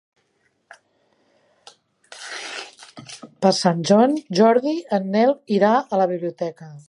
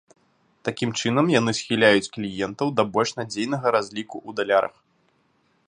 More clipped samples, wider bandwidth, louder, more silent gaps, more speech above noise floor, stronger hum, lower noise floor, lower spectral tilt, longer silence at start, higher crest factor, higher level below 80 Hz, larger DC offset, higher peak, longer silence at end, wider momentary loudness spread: neither; about the same, 11.5 kHz vs 11 kHz; first, -19 LUFS vs -23 LUFS; neither; first, 49 dB vs 43 dB; neither; about the same, -67 dBFS vs -66 dBFS; about the same, -5.5 dB/octave vs -4.5 dB/octave; first, 2.1 s vs 0.65 s; about the same, 18 dB vs 22 dB; second, -74 dBFS vs -62 dBFS; neither; about the same, -4 dBFS vs -2 dBFS; second, 0.1 s vs 1 s; first, 22 LU vs 13 LU